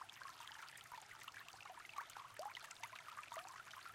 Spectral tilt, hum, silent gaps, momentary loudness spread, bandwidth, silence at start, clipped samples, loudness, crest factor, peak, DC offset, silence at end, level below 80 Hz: -0.5 dB/octave; none; none; 4 LU; 16.5 kHz; 0 s; under 0.1%; -54 LUFS; 22 dB; -32 dBFS; under 0.1%; 0 s; -86 dBFS